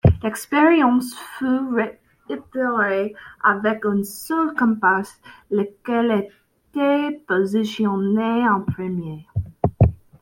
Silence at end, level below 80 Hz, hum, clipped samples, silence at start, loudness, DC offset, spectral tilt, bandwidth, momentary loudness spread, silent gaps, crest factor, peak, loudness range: 0.25 s; -42 dBFS; none; under 0.1%; 0.05 s; -21 LUFS; under 0.1%; -7 dB/octave; 16.5 kHz; 12 LU; none; 18 dB; -2 dBFS; 2 LU